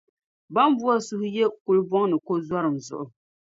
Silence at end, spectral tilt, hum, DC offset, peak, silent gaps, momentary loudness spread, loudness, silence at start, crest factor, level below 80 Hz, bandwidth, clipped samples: 0.5 s; -6 dB/octave; none; under 0.1%; -6 dBFS; 1.61-1.66 s; 12 LU; -24 LUFS; 0.5 s; 18 dB; -70 dBFS; 7.8 kHz; under 0.1%